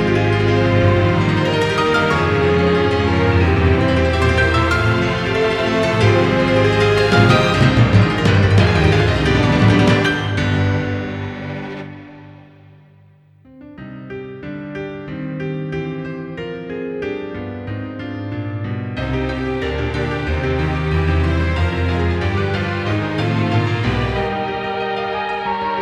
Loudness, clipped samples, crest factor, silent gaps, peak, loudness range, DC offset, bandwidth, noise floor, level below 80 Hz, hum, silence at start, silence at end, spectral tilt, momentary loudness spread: -17 LUFS; under 0.1%; 16 dB; none; 0 dBFS; 15 LU; under 0.1%; 10.5 kHz; -48 dBFS; -30 dBFS; none; 0 s; 0 s; -7 dB/octave; 14 LU